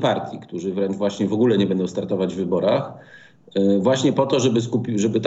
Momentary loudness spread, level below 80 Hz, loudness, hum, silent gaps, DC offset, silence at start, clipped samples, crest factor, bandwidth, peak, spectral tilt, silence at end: 9 LU; -70 dBFS; -21 LUFS; none; none; under 0.1%; 0 s; under 0.1%; 16 dB; 8 kHz; -4 dBFS; -6 dB/octave; 0 s